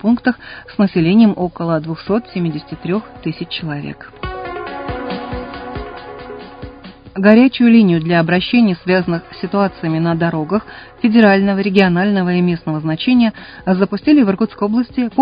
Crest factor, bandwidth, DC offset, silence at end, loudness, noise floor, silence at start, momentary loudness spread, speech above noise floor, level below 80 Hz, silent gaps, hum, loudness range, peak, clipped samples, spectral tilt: 16 dB; 5.2 kHz; under 0.1%; 0 s; -15 LUFS; -36 dBFS; 0.05 s; 17 LU; 22 dB; -42 dBFS; none; none; 12 LU; 0 dBFS; under 0.1%; -9.5 dB/octave